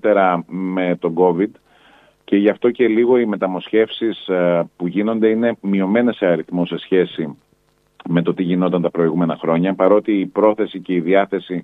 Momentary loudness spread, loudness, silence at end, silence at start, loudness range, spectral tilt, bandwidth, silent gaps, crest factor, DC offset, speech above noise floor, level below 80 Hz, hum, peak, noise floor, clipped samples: 7 LU; -18 LUFS; 0 s; 0.05 s; 2 LU; -9.5 dB/octave; 4.1 kHz; none; 16 dB; under 0.1%; 43 dB; -64 dBFS; none; 0 dBFS; -60 dBFS; under 0.1%